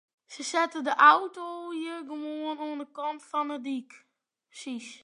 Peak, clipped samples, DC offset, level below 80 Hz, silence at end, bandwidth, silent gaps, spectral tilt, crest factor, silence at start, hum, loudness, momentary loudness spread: -6 dBFS; under 0.1%; under 0.1%; under -90 dBFS; 0.05 s; 11 kHz; none; -1.5 dB/octave; 24 dB; 0.3 s; none; -28 LUFS; 19 LU